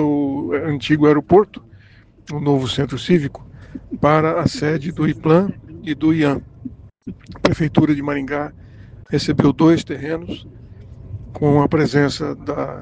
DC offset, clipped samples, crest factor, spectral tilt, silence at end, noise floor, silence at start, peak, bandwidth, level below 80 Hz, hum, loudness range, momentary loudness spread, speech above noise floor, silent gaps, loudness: under 0.1%; under 0.1%; 18 dB; -7 dB/octave; 0 s; -47 dBFS; 0 s; 0 dBFS; 9.2 kHz; -44 dBFS; none; 2 LU; 20 LU; 30 dB; none; -18 LUFS